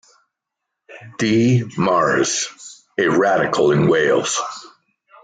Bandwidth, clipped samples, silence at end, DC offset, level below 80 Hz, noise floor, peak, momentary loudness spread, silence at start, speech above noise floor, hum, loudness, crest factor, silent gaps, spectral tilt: 9.4 kHz; under 0.1%; 0.55 s; under 0.1%; -56 dBFS; -81 dBFS; -6 dBFS; 14 LU; 0.9 s; 64 dB; none; -17 LUFS; 14 dB; none; -4.5 dB/octave